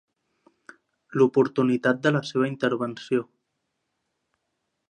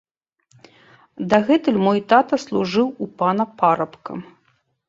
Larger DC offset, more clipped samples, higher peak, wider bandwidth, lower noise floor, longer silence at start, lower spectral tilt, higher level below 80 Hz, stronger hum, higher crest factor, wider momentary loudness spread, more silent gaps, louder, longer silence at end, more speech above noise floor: neither; neither; second, -6 dBFS vs -2 dBFS; first, 9.8 kHz vs 7.8 kHz; first, -79 dBFS vs -65 dBFS; about the same, 1.1 s vs 1.2 s; about the same, -7 dB/octave vs -6.5 dB/octave; second, -76 dBFS vs -62 dBFS; neither; about the same, 20 dB vs 18 dB; second, 8 LU vs 14 LU; neither; second, -24 LUFS vs -19 LUFS; first, 1.65 s vs 0.65 s; first, 56 dB vs 46 dB